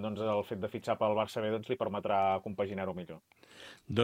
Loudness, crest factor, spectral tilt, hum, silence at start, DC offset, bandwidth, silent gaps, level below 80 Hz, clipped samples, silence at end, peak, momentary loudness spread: -34 LUFS; 22 dB; -6.5 dB/octave; none; 0 s; under 0.1%; 16.5 kHz; none; -70 dBFS; under 0.1%; 0 s; -12 dBFS; 19 LU